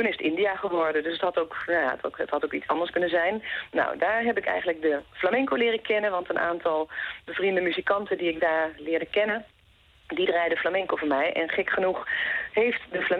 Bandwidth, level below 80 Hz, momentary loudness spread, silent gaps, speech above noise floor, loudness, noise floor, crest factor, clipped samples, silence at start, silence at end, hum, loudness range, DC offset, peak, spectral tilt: 5.8 kHz; -62 dBFS; 4 LU; none; 33 dB; -26 LUFS; -59 dBFS; 16 dB; under 0.1%; 0 s; 0 s; none; 1 LU; under 0.1%; -10 dBFS; -6.5 dB/octave